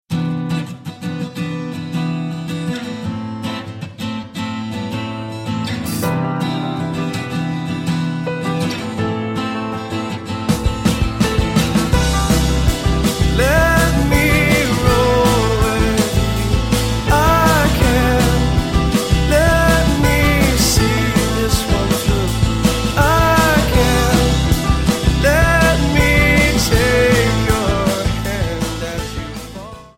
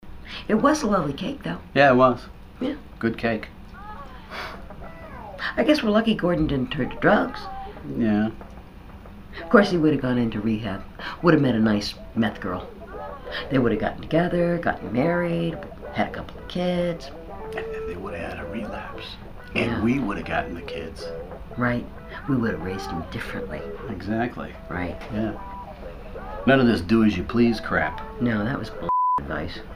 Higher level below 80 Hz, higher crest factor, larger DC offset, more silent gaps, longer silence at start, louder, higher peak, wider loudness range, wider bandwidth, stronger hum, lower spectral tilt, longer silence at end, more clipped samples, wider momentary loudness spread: first, -22 dBFS vs -42 dBFS; second, 14 dB vs 24 dB; neither; neither; about the same, 0.1 s vs 0 s; first, -16 LUFS vs -24 LUFS; about the same, -2 dBFS vs 0 dBFS; about the same, 10 LU vs 8 LU; about the same, 16.5 kHz vs 15.5 kHz; neither; second, -5 dB/octave vs -6.5 dB/octave; first, 0.15 s vs 0 s; neither; second, 12 LU vs 18 LU